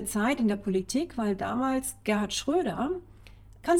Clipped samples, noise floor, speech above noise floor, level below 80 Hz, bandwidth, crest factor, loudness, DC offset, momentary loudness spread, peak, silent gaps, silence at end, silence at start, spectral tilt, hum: under 0.1%; -51 dBFS; 22 dB; -52 dBFS; 17.5 kHz; 18 dB; -29 LUFS; under 0.1%; 5 LU; -10 dBFS; none; 0 s; 0 s; -4.5 dB/octave; none